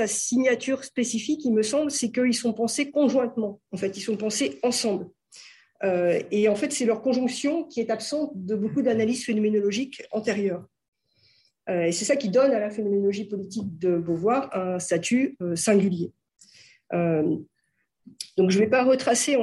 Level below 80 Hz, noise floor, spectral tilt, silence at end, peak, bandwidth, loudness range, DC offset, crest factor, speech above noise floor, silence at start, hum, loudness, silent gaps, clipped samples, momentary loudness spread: -70 dBFS; -75 dBFS; -4.5 dB/octave; 0 s; -8 dBFS; 12.5 kHz; 2 LU; under 0.1%; 16 dB; 51 dB; 0 s; none; -25 LUFS; 10.88-10.92 s; under 0.1%; 10 LU